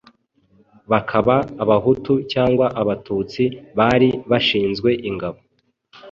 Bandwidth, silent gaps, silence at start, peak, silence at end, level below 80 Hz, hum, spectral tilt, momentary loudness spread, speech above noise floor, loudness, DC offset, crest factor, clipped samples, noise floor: 7.2 kHz; none; 0.9 s; -2 dBFS; 0 s; -48 dBFS; none; -7.5 dB/octave; 7 LU; 41 dB; -19 LUFS; under 0.1%; 18 dB; under 0.1%; -59 dBFS